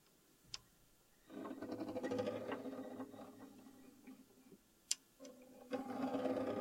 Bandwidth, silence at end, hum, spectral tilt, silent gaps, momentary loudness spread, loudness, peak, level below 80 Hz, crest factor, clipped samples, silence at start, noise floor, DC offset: 16.5 kHz; 0 s; none; -3.5 dB/octave; none; 20 LU; -45 LUFS; -16 dBFS; -80 dBFS; 30 dB; under 0.1%; 0.45 s; -71 dBFS; under 0.1%